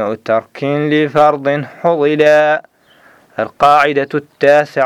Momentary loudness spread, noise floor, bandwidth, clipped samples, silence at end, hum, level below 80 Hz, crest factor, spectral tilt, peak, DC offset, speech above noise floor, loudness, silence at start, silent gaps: 10 LU; -47 dBFS; 12.5 kHz; under 0.1%; 0 s; none; -56 dBFS; 12 dB; -6 dB/octave; 0 dBFS; under 0.1%; 35 dB; -13 LUFS; 0 s; none